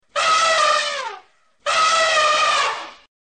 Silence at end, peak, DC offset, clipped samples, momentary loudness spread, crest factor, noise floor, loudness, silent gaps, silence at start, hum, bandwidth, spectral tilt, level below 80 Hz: 0.3 s; -8 dBFS; under 0.1%; under 0.1%; 14 LU; 12 dB; -49 dBFS; -17 LUFS; none; 0.15 s; none; 9.4 kHz; 1.5 dB/octave; -62 dBFS